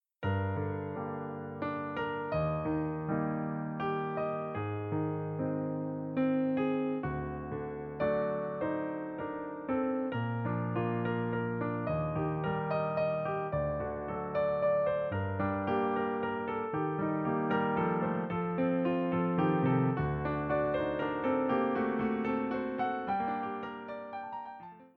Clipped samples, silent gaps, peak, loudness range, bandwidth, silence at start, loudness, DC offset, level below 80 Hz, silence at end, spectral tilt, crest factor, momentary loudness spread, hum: under 0.1%; none; -16 dBFS; 4 LU; 5.2 kHz; 0.2 s; -33 LUFS; under 0.1%; -56 dBFS; 0.1 s; -10.5 dB/octave; 16 dB; 8 LU; none